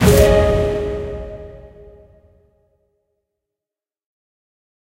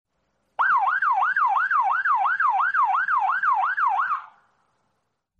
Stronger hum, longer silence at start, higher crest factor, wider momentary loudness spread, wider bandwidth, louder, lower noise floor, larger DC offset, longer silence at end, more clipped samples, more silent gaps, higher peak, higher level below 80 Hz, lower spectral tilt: neither; second, 0 s vs 0.6 s; first, 20 dB vs 12 dB; first, 23 LU vs 4 LU; first, 16 kHz vs 7.2 kHz; first, -16 LUFS vs -21 LUFS; first, -89 dBFS vs -75 dBFS; neither; first, 3.35 s vs 1.15 s; neither; neither; first, 0 dBFS vs -12 dBFS; first, -28 dBFS vs -80 dBFS; first, -6 dB/octave vs -1 dB/octave